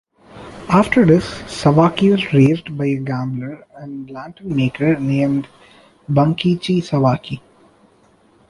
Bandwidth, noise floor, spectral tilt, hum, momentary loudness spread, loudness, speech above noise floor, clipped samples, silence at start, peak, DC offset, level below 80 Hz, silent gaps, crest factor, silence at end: 11.5 kHz; -53 dBFS; -7.5 dB/octave; none; 18 LU; -17 LUFS; 37 dB; under 0.1%; 0.35 s; -2 dBFS; under 0.1%; -48 dBFS; none; 16 dB; 1.1 s